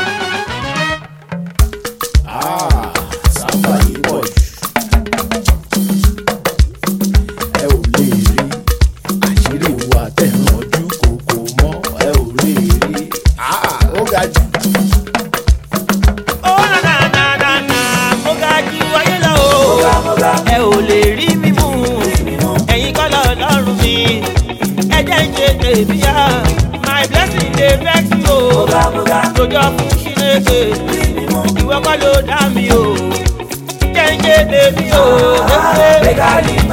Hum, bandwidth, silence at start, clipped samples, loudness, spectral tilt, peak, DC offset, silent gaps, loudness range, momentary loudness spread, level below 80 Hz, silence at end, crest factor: none; 17 kHz; 0 s; under 0.1%; -12 LUFS; -4.5 dB/octave; 0 dBFS; under 0.1%; none; 4 LU; 7 LU; -18 dBFS; 0 s; 12 dB